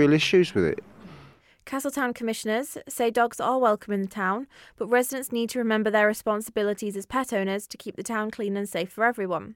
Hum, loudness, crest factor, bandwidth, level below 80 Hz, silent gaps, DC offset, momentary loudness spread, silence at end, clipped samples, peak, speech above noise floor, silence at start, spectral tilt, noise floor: none; -26 LUFS; 16 dB; 17 kHz; -60 dBFS; none; under 0.1%; 10 LU; 0 s; under 0.1%; -10 dBFS; 27 dB; 0 s; -4.5 dB/octave; -52 dBFS